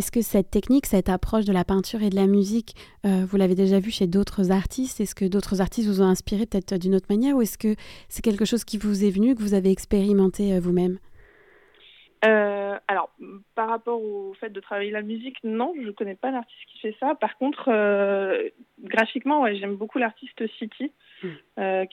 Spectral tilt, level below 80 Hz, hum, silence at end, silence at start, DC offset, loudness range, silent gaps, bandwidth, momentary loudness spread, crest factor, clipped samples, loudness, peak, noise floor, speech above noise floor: -6 dB/octave; -44 dBFS; none; 0.05 s; 0 s; under 0.1%; 6 LU; none; 16 kHz; 12 LU; 16 dB; under 0.1%; -24 LUFS; -8 dBFS; -55 dBFS; 32 dB